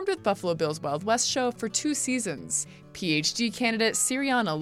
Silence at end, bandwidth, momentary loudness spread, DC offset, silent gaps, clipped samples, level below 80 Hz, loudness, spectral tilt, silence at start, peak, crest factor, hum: 0 s; 16 kHz; 5 LU; under 0.1%; none; under 0.1%; -64 dBFS; -26 LUFS; -2.5 dB/octave; 0 s; -10 dBFS; 16 dB; none